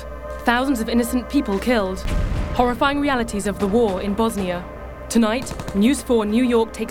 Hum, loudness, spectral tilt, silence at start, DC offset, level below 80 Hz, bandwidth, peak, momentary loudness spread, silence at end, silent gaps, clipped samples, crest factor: none; -20 LUFS; -5.5 dB/octave; 0 s; under 0.1%; -32 dBFS; 17 kHz; 0 dBFS; 7 LU; 0 s; none; under 0.1%; 20 dB